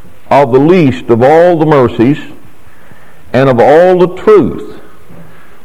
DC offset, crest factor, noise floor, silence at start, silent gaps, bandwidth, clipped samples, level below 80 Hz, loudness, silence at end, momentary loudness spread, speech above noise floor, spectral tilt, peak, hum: 5%; 8 dB; -40 dBFS; 0.3 s; none; 12.5 kHz; 3%; -40 dBFS; -7 LUFS; 0.85 s; 7 LU; 33 dB; -8 dB/octave; 0 dBFS; none